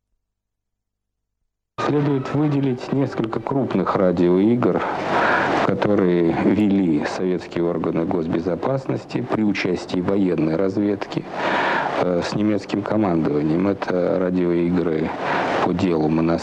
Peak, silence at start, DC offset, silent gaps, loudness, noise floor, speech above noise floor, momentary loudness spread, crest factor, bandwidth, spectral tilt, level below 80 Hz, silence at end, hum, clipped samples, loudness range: -4 dBFS; 1.8 s; under 0.1%; none; -20 LUFS; -79 dBFS; 60 dB; 5 LU; 16 dB; 9 kHz; -7.5 dB/octave; -52 dBFS; 0 s; 50 Hz at -50 dBFS; under 0.1%; 4 LU